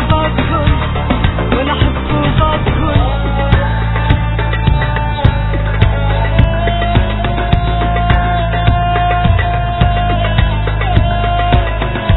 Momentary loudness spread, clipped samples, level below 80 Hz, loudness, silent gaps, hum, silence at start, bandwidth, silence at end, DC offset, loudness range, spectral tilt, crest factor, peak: 3 LU; 0.2%; -16 dBFS; -14 LUFS; none; none; 0 s; 4.1 kHz; 0 s; 0.5%; 1 LU; -10 dB/octave; 12 dB; 0 dBFS